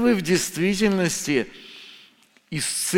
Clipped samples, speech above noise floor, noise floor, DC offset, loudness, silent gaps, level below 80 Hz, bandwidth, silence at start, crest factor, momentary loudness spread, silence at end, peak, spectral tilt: under 0.1%; 33 dB; -56 dBFS; under 0.1%; -23 LUFS; none; -54 dBFS; 17 kHz; 0 s; 18 dB; 20 LU; 0 s; -6 dBFS; -4 dB/octave